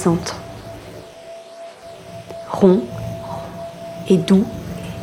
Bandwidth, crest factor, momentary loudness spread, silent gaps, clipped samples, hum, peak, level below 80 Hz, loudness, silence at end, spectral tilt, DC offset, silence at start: 13.5 kHz; 20 dB; 22 LU; none; under 0.1%; none; 0 dBFS; -48 dBFS; -19 LUFS; 0 s; -7 dB/octave; under 0.1%; 0 s